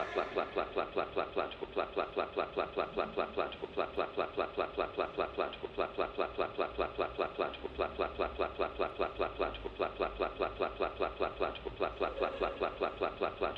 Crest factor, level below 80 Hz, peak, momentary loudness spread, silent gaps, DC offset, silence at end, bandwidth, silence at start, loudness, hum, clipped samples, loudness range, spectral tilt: 18 dB; -54 dBFS; -18 dBFS; 2 LU; none; under 0.1%; 0 s; 6.6 kHz; 0 s; -37 LUFS; none; under 0.1%; 0 LU; -6.5 dB/octave